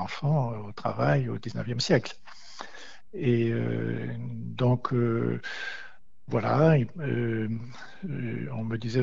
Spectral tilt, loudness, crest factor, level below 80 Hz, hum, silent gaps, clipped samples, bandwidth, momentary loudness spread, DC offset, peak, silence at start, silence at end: -7 dB/octave; -28 LUFS; 20 dB; -56 dBFS; none; none; under 0.1%; 7.8 kHz; 17 LU; 0.9%; -8 dBFS; 0 s; 0 s